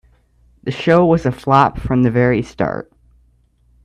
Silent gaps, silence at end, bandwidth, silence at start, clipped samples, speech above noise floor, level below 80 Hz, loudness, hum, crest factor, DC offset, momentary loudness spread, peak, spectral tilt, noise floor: none; 1 s; 10.5 kHz; 0.65 s; under 0.1%; 41 dB; -40 dBFS; -16 LUFS; none; 16 dB; under 0.1%; 12 LU; 0 dBFS; -8 dB/octave; -55 dBFS